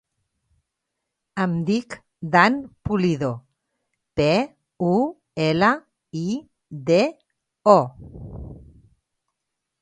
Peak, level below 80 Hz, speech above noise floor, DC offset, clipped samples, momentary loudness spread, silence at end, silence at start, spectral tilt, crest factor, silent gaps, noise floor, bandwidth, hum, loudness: 0 dBFS; -50 dBFS; 61 dB; under 0.1%; under 0.1%; 21 LU; 1.25 s; 1.35 s; -6.5 dB/octave; 24 dB; none; -81 dBFS; 9.6 kHz; none; -22 LUFS